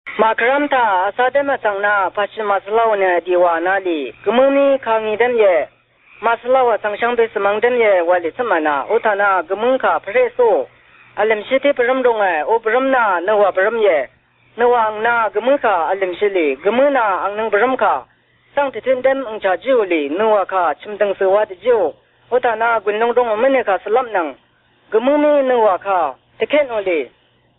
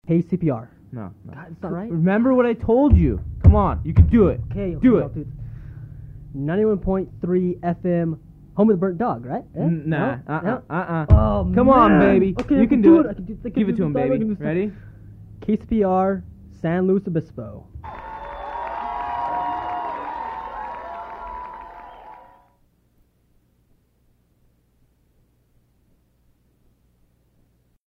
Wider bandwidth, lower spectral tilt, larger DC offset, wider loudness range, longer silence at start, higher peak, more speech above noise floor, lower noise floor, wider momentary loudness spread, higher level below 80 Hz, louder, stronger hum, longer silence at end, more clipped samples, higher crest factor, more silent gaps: second, 4.1 kHz vs 4.8 kHz; second, -8 dB/octave vs -10.5 dB/octave; neither; second, 2 LU vs 13 LU; about the same, 0.05 s vs 0.05 s; about the same, -2 dBFS vs 0 dBFS; second, 38 dB vs 43 dB; second, -54 dBFS vs -62 dBFS; second, 6 LU vs 21 LU; second, -60 dBFS vs -32 dBFS; first, -16 LUFS vs -20 LUFS; neither; second, 0.5 s vs 5.75 s; neither; second, 14 dB vs 20 dB; neither